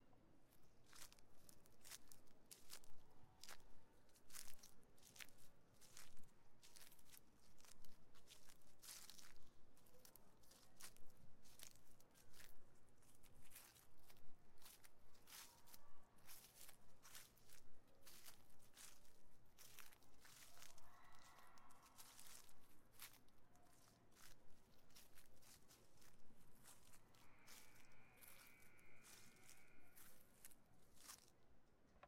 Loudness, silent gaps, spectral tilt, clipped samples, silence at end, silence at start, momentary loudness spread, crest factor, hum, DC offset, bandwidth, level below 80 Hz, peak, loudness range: -65 LUFS; none; -2 dB/octave; under 0.1%; 0 s; 0 s; 8 LU; 20 dB; none; under 0.1%; 16 kHz; -76 dBFS; -34 dBFS; 4 LU